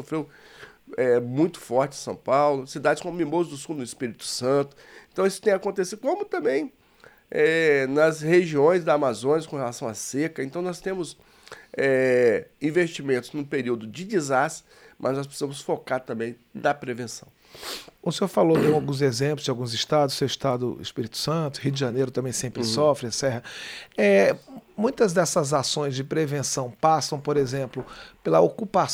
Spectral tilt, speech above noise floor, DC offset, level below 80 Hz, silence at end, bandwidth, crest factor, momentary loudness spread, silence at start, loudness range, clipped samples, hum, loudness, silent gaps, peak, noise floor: -5 dB/octave; 30 dB; under 0.1%; -62 dBFS; 0 s; 16.5 kHz; 18 dB; 13 LU; 0 s; 5 LU; under 0.1%; none; -24 LUFS; none; -6 dBFS; -54 dBFS